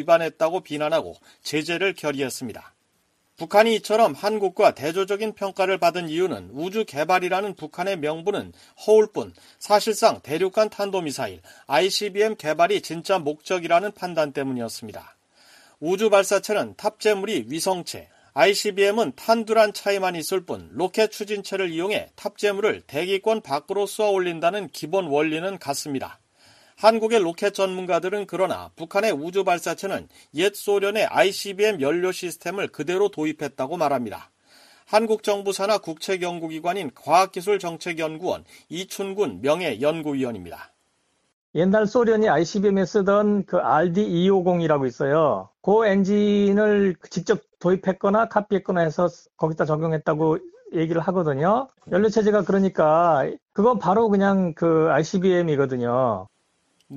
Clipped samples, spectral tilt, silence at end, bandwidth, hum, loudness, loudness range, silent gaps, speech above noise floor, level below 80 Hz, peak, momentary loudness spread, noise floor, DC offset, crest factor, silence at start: under 0.1%; -5 dB/octave; 0 s; 15 kHz; none; -22 LUFS; 5 LU; 41.33-41.54 s, 53.42-53.46 s; 46 dB; -62 dBFS; -2 dBFS; 10 LU; -69 dBFS; under 0.1%; 20 dB; 0 s